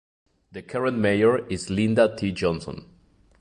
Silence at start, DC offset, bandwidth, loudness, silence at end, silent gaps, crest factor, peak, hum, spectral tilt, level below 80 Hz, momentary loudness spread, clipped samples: 0.55 s; under 0.1%; 11 kHz; -23 LUFS; 0.55 s; none; 18 dB; -6 dBFS; none; -6 dB/octave; -50 dBFS; 20 LU; under 0.1%